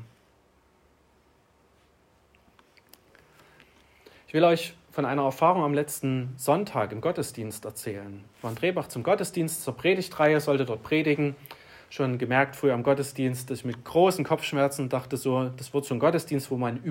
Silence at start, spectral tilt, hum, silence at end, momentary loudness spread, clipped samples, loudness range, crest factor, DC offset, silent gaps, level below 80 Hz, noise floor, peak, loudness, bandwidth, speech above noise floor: 0 s; -5.5 dB/octave; none; 0 s; 13 LU; under 0.1%; 4 LU; 20 dB; under 0.1%; none; -68 dBFS; -63 dBFS; -8 dBFS; -27 LUFS; 16 kHz; 37 dB